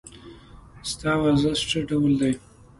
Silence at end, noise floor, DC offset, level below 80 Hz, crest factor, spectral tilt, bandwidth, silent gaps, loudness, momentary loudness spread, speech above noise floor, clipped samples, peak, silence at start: 0.4 s; -46 dBFS; under 0.1%; -46 dBFS; 16 dB; -5.5 dB/octave; 11.5 kHz; none; -23 LUFS; 12 LU; 24 dB; under 0.1%; -10 dBFS; 0.05 s